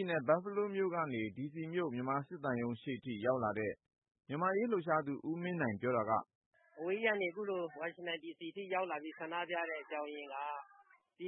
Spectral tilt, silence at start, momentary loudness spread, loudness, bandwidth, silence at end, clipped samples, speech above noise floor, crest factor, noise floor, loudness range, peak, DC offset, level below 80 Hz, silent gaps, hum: -2.5 dB/octave; 0 s; 9 LU; -38 LUFS; 3.8 kHz; 0 s; under 0.1%; 21 dB; 20 dB; -59 dBFS; 4 LU; -18 dBFS; under 0.1%; -80 dBFS; 6.35-6.51 s; none